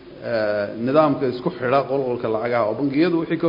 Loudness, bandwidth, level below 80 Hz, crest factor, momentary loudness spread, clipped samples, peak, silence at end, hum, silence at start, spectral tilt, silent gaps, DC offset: -21 LUFS; 5.4 kHz; -60 dBFS; 18 dB; 6 LU; under 0.1%; -2 dBFS; 0 s; none; 0 s; -9.5 dB/octave; none; under 0.1%